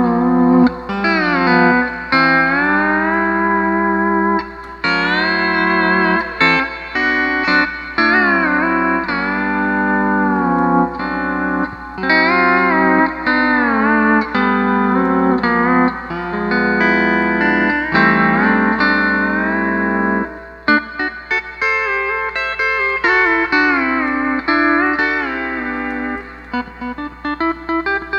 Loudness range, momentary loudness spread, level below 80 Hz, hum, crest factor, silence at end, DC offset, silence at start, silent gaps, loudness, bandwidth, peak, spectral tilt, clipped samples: 3 LU; 9 LU; -42 dBFS; 60 Hz at -40 dBFS; 16 dB; 0 s; under 0.1%; 0 s; none; -15 LUFS; 7.6 kHz; 0 dBFS; -7 dB/octave; under 0.1%